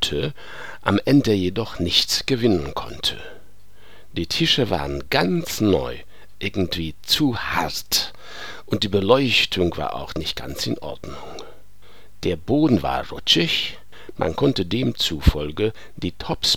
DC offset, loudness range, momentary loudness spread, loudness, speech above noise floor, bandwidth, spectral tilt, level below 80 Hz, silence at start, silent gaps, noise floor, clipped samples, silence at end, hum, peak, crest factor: 2%; 3 LU; 16 LU; -21 LUFS; 30 dB; 19.5 kHz; -4.5 dB/octave; -36 dBFS; 0 s; none; -52 dBFS; under 0.1%; 0 s; none; 0 dBFS; 22 dB